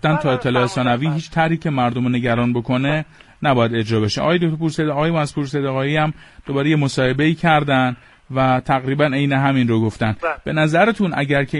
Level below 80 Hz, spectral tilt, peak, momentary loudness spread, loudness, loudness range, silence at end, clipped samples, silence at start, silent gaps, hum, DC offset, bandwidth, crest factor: -46 dBFS; -6.5 dB/octave; -2 dBFS; 6 LU; -18 LUFS; 2 LU; 0 s; under 0.1%; 0.05 s; none; none; under 0.1%; 11.5 kHz; 16 dB